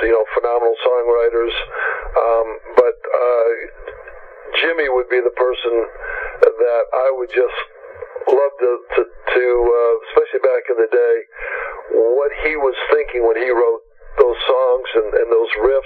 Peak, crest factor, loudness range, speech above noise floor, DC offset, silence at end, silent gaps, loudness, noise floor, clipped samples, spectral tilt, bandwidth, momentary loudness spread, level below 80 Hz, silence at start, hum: 0 dBFS; 16 dB; 2 LU; 21 dB; under 0.1%; 0 s; none; -17 LUFS; -37 dBFS; under 0.1%; -6 dB/octave; 4.6 kHz; 10 LU; -42 dBFS; 0 s; none